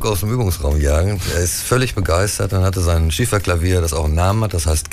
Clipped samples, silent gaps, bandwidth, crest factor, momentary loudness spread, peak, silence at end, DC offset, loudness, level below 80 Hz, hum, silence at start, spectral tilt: under 0.1%; none; 16 kHz; 14 dB; 2 LU; -2 dBFS; 0 s; under 0.1%; -17 LUFS; -24 dBFS; none; 0 s; -5 dB/octave